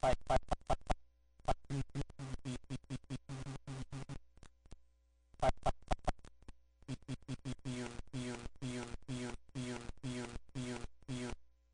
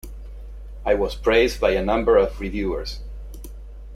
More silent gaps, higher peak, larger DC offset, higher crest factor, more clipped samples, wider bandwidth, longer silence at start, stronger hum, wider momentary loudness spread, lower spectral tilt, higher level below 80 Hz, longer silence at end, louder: neither; second, -20 dBFS vs -4 dBFS; neither; about the same, 20 dB vs 18 dB; neither; second, 10 kHz vs 15.5 kHz; about the same, 0.05 s vs 0.05 s; neither; second, 12 LU vs 22 LU; about the same, -5.5 dB/octave vs -5.5 dB/octave; second, -48 dBFS vs -34 dBFS; first, 0.25 s vs 0 s; second, -43 LUFS vs -21 LUFS